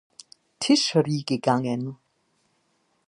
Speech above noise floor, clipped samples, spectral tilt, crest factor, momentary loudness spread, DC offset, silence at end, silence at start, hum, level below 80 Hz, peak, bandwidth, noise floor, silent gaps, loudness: 47 dB; under 0.1%; -5 dB/octave; 20 dB; 11 LU; under 0.1%; 1.15 s; 0.6 s; none; -72 dBFS; -8 dBFS; 11.5 kHz; -69 dBFS; none; -23 LUFS